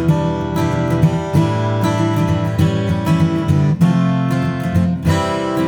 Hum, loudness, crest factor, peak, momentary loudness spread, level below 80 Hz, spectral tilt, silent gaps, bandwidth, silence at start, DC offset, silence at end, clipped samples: none; -16 LUFS; 14 dB; 0 dBFS; 4 LU; -38 dBFS; -7.5 dB/octave; none; 18.5 kHz; 0 s; under 0.1%; 0 s; under 0.1%